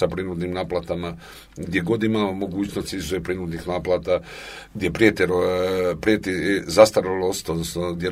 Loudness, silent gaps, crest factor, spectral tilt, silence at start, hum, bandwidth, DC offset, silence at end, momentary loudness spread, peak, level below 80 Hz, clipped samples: -22 LUFS; none; 22 dB; -5 dB/octave; 0 s; none; 16 kHz; under 0.1%; 0 s; 12 LU; 0 dBFS; -46 dBFS; under 0.1%